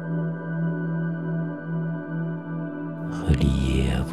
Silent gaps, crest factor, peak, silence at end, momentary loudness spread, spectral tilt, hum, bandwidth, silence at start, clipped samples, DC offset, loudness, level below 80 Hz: none; 18 dB; -8 dBFS; 0 s; 9 LU; -7.5 dB/octave; none; 11.5 kHz; 0 s; under 0.1%; 0.2%; -27 LUFS; -34 dBFS